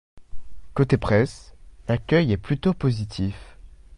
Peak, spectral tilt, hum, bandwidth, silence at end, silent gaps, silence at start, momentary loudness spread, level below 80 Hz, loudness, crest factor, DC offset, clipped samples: -4 dBFS; -7.5 dB/octave; none; 11 kHz; 0 s; none; 0.15 s; 11 LU; -42 dBFS; -23 LUFS; 20 dB; under 0.1%; under 0.1%